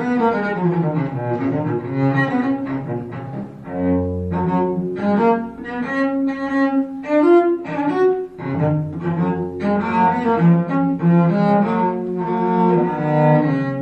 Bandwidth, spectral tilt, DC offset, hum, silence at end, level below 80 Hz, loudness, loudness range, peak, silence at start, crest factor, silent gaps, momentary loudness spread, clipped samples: 6.4 kHz; -10 dB/octave; under 0.1%; none; 0 s; -44 dBFS; -19 LUFS; 4 LU; -2 dBFS; 0 s; 14 dB; none; 8 LU; under 0.1%